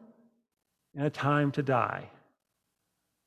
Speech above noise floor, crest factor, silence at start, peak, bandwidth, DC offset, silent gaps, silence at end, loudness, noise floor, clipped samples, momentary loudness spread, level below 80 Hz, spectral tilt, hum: 53 dB; 22 dB; 0.95 s; -12 dBFS; 9.4 kHz; under 0.1%; none; 1.2 s; -29 LUFS; -82 dBFS; under 0.1%; 12 LU; -72 dBFS; -8 dB/octave; none